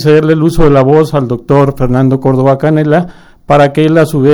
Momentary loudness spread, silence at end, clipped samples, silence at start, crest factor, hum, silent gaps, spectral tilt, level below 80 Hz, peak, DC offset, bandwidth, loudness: 4 LU; 0 s; 1%; 0 s; 8 dB; none; none; -8 dB/octave; -24 dBFS; 0 dBFS; under 0.1%; over 20 kHz; -9 LUFS